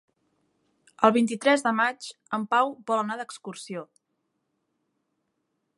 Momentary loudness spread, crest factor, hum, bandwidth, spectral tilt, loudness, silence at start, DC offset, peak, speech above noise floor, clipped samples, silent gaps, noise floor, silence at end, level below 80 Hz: 16 LU; 24 dB; none; 11.5 kHz; -4 dB/octave; -25 LUFS; 1 s; under 0.1%; -4 dBFS; 52 dB; under 0.1%; none; -78 dBFS; 1.95 s; -82 dBFS